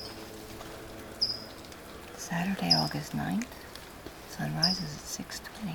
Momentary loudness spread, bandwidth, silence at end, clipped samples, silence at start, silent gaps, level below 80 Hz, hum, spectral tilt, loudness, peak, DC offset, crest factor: 19 LU; over 20 kHz; 0 s; under 0.1%; 0 s; none; -56 dBFS; none; -4 dB/octave; -31 LUFS; -10 dBFS; under 0.1%; 24 dB